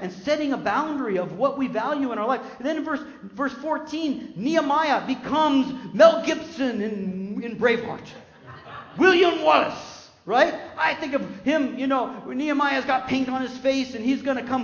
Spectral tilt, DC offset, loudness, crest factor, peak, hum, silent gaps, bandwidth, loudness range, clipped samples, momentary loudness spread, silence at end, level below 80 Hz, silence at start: -5 dB/octave; under 0.1%; -23 LUFS; 22 dB; -2 dBFS; none; none; 7.2 kHz; 4 LU; under 0.1%; 12 LU; 0 s; -62 dBFS; 0 s